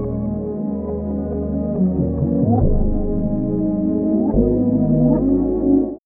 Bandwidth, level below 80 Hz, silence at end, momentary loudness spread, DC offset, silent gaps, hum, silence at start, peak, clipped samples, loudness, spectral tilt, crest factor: 2.1 kHz; -26 dBFS; 0.1 s; 8 LU; under 0.1%; none; none; 0 s; -4 dBFS; under 0.1%; -19 LUFS; -17 dB/octave; 14 dB